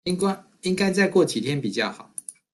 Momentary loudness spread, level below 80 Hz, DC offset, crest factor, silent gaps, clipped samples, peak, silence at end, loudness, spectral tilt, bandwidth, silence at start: 16 LU; -62 dBFS; under 0.1%; 18 dB; none; under 0.1%; -8 dBFS; 0.2 s; -23 LUFS; -5 dB/octave; 12.5 kHz; 0.05 s